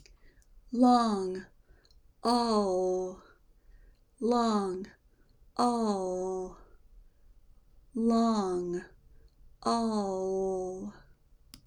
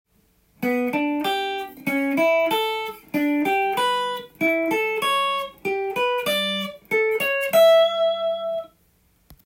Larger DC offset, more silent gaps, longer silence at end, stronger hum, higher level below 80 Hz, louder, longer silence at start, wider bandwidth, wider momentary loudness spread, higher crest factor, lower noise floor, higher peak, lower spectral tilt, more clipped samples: neither; neither; about the same, 0.1 s vs 0.1 s; neither; first, -58 dBFS vs -64 dBFS; second, -30 LUFS vs -22 LUFS; about the same, 0.55 s vs 0.6 s; second, 11.5 kHz vs 16.5 kHz; first, 15 LU vs 10 LU; about the same, 20 dB vs 16 dB; about the same, -62 dBFS vs -62 dBFS; second, -12 dBFS vs -6 dBFS; first, -5.5 dB/octave vs -3.5 dB/octave; neither